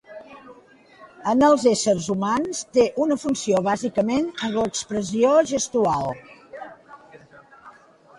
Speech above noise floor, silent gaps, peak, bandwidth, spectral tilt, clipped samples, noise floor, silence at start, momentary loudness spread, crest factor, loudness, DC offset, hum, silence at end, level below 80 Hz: 30 dB; none; -6 dBFS; 11.5 kHz; -4.5 dB/octave; under 0.1%; -51 dBFS; 0.1 s; 22 LU; 18 dB; -21 LUFS; under 0.1%; none; 0.5 s; -58 dBFS